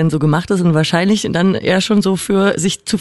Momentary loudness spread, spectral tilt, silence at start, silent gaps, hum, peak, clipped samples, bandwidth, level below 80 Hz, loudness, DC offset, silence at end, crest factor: 2 LU; -5.5 dB/octave; 0 s; none; none; -2 dBFS; under 0.1%; 12 kHz; -48 dBFS; -14 LUFS; under 0.1%; 0 s; 12 dB